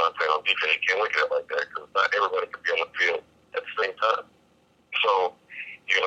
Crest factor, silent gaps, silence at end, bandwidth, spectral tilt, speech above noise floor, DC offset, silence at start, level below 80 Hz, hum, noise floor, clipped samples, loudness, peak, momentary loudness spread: 20 dB; none; 0 s; 8.4 kHz; -0.5 dB/octave; 37 dB; under 0.1%; 0 s; -74 dBFS; none; -62 dBFS; under 0.1%; -25 LUFS; -6 dBFS; 11 LU